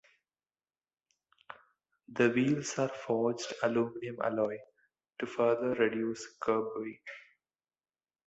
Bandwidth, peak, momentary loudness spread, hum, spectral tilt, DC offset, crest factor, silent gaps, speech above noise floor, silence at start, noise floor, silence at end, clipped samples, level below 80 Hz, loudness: 8.2 kHz; -14 dBFS; 20 LU; none; -5.5 dB/octave; under 0.1%; 20 dB; none; over 58 dB; 1.5 s; under -90 dBFS; 1.05 s; under 0.1%; -74 dBFS; -33 LUFS